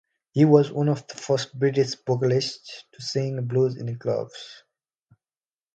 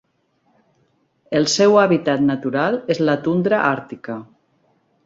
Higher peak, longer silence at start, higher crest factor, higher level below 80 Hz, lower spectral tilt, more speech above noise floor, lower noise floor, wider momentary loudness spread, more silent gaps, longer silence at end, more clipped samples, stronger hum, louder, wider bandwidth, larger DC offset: about the same, -4 dBFS vs -2 dBFS; second, 0.35 s vs 1.3 s; about the same, 20 dB vs 18 dB; second, -68 dBFS vs -60 dBFS; first, -6.5 dB/octave vs -5 dB/octave; first, over 67 dB vs 47 dB; first, under -90 dBFS vs -64 dBFS; about the same, 18 LU vs 17 LU; neither; first, 1.2 s vs 0.8 s; neither; neither; second, -24 LUFS vs -18 LUFS; first, 9 kHz vs 7.8 kHz; neither